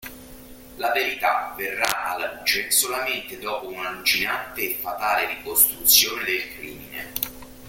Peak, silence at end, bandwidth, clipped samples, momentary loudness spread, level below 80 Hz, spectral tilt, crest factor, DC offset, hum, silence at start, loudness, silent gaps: 0 dBFS; 0 s; 17 kHz; under 0.1%; 14 LU; -54 dBFS; 0 dB/octave; 24 dB; under 0.1%; none; 0 s; -22 LUFS; none